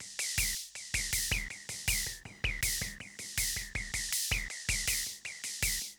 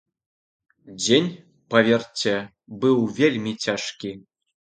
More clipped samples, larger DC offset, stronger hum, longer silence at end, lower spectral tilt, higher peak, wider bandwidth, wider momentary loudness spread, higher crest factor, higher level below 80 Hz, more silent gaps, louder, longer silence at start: neither; neither; neither; second, 0.05 s vs 0.5 s; second, -0.5 dB/octave vs -4.5 dB/octave; second, -12 dBFS vs -2 dBFS; first, over 20 kHz vs 9.2 kHz; second, 8 LU vs 14 LU; about the same, 24 dB vs 22 dB; first, -46 dBFS vs -66 dBFS; neither; second, -33 LUFS vs -22 LUFS; second, 0 s vs 0.85 s